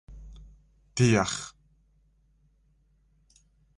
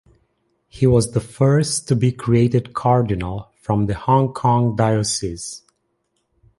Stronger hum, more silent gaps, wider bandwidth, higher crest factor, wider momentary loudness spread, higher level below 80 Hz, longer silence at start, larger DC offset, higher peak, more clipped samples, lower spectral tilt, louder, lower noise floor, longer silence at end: neither; neither; about the same, 11 kHz vs 11.5 kHz; first, 22 dB vs 16 dB; first, 27 LU vs 11 LU; second, -52 dBFS vs -42 dBFS; second, 0.1 s vs 0.75 s; neither; second, -10 dBFS vs -2 dBFS; neither; about the same, -5 dB/octave vs -6 dB/octave; second, -26 LUFS vs -19 LUFS; second, -66 dBFS vs -70 dBFS; first, 2.3 s vs 1 s